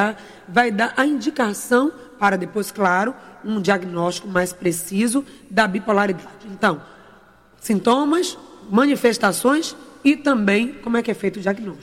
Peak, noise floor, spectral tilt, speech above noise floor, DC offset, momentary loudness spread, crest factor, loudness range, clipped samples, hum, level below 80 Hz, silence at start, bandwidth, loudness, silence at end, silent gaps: -4 dBFS; -50 dBFS; -4.5 dB/octave; 31 dB; under 0.1%; 9 LU; 16 dB; 3 LU; under 0.1%; none; -58 dBFS; 0 s; 16.5 kHz; -20 LUFS; 0 s; none